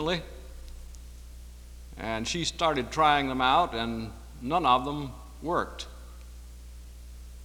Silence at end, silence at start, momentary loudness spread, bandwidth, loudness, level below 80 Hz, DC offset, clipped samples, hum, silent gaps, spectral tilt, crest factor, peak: 0 s; 0 s; 24 LU; 20 kHz; -28 LUFS; -44 dBFS; under 0.1%; under 0.1%; 60 Hz at -45 dBFS; none; -4 dB/octave; 22 dB; -8 dBFS